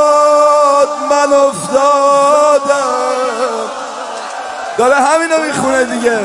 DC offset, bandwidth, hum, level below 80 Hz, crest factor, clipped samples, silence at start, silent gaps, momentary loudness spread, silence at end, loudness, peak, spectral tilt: under 0.1%; 11.5 kHz; none; -56 dBFS; 10 dB; under 0.1%; 0 s; none; 14 LU; 0 s; -11 LUFS; 0 dBFS; -3 dB/octave